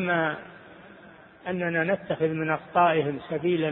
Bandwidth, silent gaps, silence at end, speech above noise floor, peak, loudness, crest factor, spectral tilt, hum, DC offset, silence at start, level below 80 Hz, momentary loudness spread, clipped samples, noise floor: 4.1 kHz; none; 0 s; 24 dB; -8 dBFS; -26 LUFS; 18 dB; -10.5 dB/octave; none; under 0.1%; 0 s; -64 dBFS; 16 LU; under 0.1%; -50 dBFS